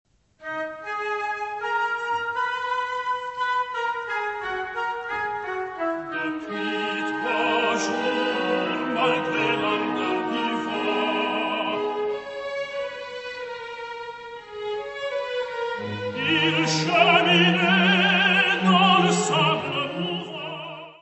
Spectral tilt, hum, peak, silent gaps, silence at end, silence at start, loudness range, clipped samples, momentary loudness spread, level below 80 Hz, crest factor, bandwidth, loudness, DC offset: -4 dB/octave; none; -4 dBFS; none; 0.05 s; 0.4 s; 12 LU; under 0.1%; 15 LU; -66 dBFS; 20 dB; 8.4 kHz; -23 LUFS; under 0.1%